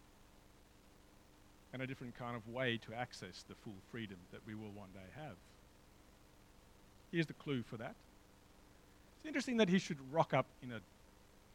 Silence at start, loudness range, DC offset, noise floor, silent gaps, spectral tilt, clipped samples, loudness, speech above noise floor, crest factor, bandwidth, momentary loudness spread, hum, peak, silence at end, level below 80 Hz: 0.1 s; 13 LU; under 0.1%; -65 dBFS; none; -5.5 dB/octave; under 0.1%; -42 LUFS; 23 dB; 24 dB; 16.5 kHz; 18 LU; none; -20 dBFS; 0.3 s; -68 dBFS